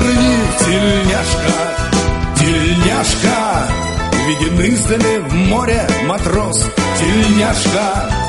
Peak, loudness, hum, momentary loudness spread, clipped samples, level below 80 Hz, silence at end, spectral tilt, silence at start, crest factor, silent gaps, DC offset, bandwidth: 0 dBFS; -14 LUFS; none; 4 LU; under 0.1%; -24 dBFS; 0 s; -4.5 dB/octave; 0 s; 14 dB; none; under 0.1%; 11.5 kHz